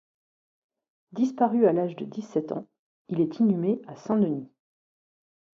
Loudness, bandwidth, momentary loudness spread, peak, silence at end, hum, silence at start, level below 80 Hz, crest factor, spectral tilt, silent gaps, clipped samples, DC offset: -26 LUFS; 7.2 kHz; 13 LU; -8 dBFS; 1.1 s; none; 1.15 s; -76 dBFS; 18 dB; -9 dB/octave; 2.79-3.05 s; under 0.1%; under 0.1%